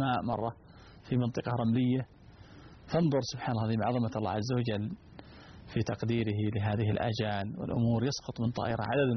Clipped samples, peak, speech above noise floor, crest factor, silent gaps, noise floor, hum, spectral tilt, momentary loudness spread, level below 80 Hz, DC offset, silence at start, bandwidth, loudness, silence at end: under 0.1%; -18 dBFS; 22 dB; 14 dB; none; -53 dBFS; none; -6.5 dB/octave; 11 LU; -58 dBFS; under 0.1%; 0 s; 6.4 kHz; -32 LUFS; 0 s